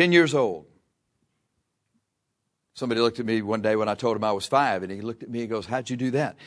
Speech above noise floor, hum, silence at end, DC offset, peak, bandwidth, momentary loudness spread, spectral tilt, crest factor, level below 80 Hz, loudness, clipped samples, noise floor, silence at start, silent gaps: 54 dB; none; 0 s; under 0.1%; -4 dBFS; 11 kHz; 10 LU; -5.5 dB/octave; 22 dB; -68 dBFS; -25 LUFS; under 0.1%; -79 dBFS; 0 s; none